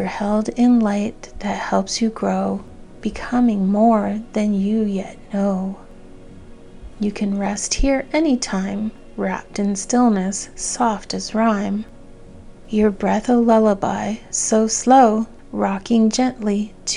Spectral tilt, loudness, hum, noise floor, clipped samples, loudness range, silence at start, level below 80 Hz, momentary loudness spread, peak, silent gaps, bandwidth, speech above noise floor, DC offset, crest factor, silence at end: -5 dB/octave; -19 LUFS; none; -39 dBFS; under 0.1%; 6 LU; 0 s; -38 dBFS; 11 LU; -2 dBFS; none; 11 kHz; 21 dB; under 0.1%; 18 dB; 0 s